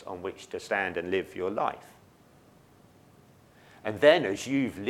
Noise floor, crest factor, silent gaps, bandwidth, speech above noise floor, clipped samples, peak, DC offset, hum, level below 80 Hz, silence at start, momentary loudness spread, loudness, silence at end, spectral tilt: -58 dBFS; 26 dB; none; 14.5 kHz; 30 dB; under 0.1%; -4 dBFS; under 0.1%; none; -68 dBFS; 0 s; 17 LU; -28 LUFS; 0 s; -4.5 dB/octave